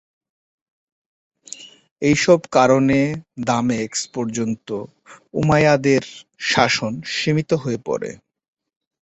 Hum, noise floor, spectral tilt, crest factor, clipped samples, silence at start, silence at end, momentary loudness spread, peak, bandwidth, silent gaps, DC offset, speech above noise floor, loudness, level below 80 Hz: none; -40 dBFS; -5 dB/octave; 20 dB; under 0.1%; 1.5 s; 0.85 s; 16 LU; -2 dBFS; 8.2 kHz; 1.91-1.96 s; under 0.1%; 22 dB; -19 LUFS; -52 dBFS